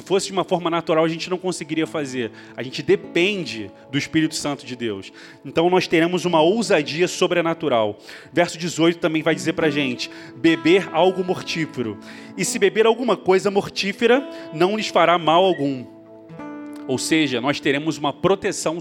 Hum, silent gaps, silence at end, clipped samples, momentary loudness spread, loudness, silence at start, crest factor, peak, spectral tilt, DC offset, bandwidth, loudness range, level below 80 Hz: none; none; 0 s; under 0.1%; 13 LU; -20 LUFS; 0 s; 20 dB; -2 dBFS; -4.5 dB/octave; under 0.1%; 16.5 kHz; 4 LU; -62 dBFS